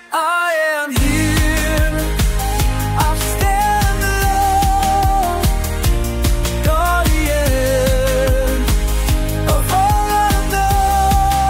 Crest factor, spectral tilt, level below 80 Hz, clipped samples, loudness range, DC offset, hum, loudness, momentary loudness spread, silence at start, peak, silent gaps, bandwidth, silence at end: 12 dB; -4.5 dB/octave; -18 dBFS; under 0.1%; 1 LU; under 0.1%; none; -16 LUFS; 4 LU; 0.1 s; -2 dBFS; none; 16 kHz; 0 s